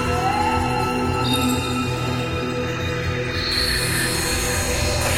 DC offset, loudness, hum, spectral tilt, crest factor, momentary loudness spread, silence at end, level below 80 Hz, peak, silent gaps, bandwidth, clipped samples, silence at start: under 0.1%; -21 LUFS; none; -4 dB/octave; 14 dB; 5 LU; 0 s; -34 dBFS; -8 dBFS; none; 16.5 kHz; under 0.1%; 0 s